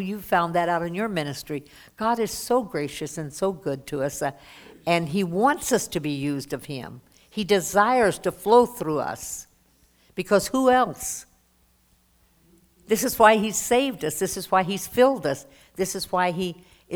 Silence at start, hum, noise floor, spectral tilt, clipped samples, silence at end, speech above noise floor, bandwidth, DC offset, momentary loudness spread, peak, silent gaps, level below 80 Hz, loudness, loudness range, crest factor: 0 s; none; -63 dBFS; -4 dB/octave; under 0.1%; 0 s; 39 dB; over 20 kHz; under 0.1%; 14 LU; -2 dBFS; none; -56 dBFS; -24 LUFS; 5 LU; 22 dB